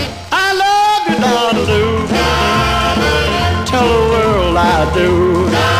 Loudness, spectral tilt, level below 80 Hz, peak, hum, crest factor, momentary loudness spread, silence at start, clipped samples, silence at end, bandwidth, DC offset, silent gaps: -13 LUFS; -5 dB/octave; -26 dBFS; 0 dBFS; none; 12 dB; 2 LU; 0 s; under 0.1%; 0 s; 16 kHz; 0.2%; none